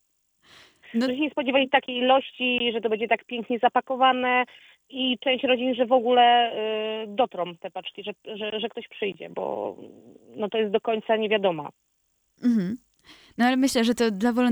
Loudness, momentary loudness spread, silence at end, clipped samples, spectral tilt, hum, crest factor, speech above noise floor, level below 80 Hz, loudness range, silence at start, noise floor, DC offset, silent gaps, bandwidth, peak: -24 LUFS; 13 LU; 0 s; under 0.1%; -4 dB/octave; none; 18 dB; 48 dB; -68 dBFS; 8 LU; 0.9 s; -72 dBFS; under 0.1%; none; over 20 kHz; -6 dBFS